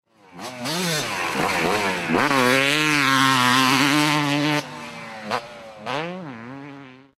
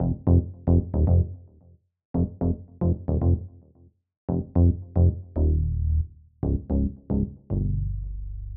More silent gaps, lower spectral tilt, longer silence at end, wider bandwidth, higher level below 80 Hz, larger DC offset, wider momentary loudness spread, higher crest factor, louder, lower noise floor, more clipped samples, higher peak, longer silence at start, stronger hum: second, none vs 2.05-2.14 s, 4.17-4.28 s; second, -3.5 dB/octave vs -16 dB/octave; first, 0.2 s vs 0 s; first, 16 kHz vs 1.5 kHz; second, -60 dBFS vs -30 dBFS; neither; first, 19 LU vs 10 LU; about the same, 18 dB vs 16 dB; first, -20 LUFS vs -26 LUFS; second, -42 dBFS vs -57 dBFS; neither; first, -4 dBFS vs -8 dBFS; first, 0.35 s vs 0 s; neither